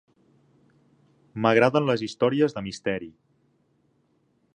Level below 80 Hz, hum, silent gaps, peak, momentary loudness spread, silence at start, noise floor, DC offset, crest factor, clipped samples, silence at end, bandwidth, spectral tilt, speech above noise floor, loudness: -64 dBFS; none; none; -4 dBFS; 14 LU; 1.35 s; -68 dBFS; under 0.1%; 24 dB; under 0.1%; 1.45 s; 9.8 kHz; -6 dB/octave; 44 dB; -24 LUFS